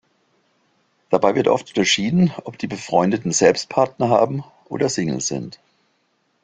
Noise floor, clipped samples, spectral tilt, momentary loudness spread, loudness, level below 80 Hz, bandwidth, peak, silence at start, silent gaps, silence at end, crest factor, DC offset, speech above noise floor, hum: -66 dBFS; under 0.1%; -4.5 dB/octave; 13 LU; -19 LUFS; -58 dBFS; 9.6 kHz; 0 dBFS; 1.1 s; none; 0.9 s; 20 dB; under 0.1%; 48 dB; none